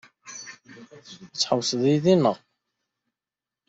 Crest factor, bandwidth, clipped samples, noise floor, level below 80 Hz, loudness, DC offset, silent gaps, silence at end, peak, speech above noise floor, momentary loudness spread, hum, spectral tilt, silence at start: 20 dB; 8 kHz; under 0.1%; -90 dBFS; -68 dBFS; -22 LUFS; under 0.1%; none; 1.35 s; -6 dBFS; 68 dB; 23 LU; none; -5 dB/octave; 0.25 s